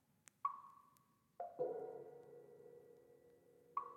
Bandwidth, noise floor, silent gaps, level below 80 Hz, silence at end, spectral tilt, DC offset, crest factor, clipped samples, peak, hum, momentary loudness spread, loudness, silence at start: 15.5 kHz; -76 dBFS; none; under -90 dBFS; 0 s; -6 dB/octave; under 0.1%; 24 dB; under 0.1%; -28 dBFS; none; 23 LU; -49 LUFS; 0.45 s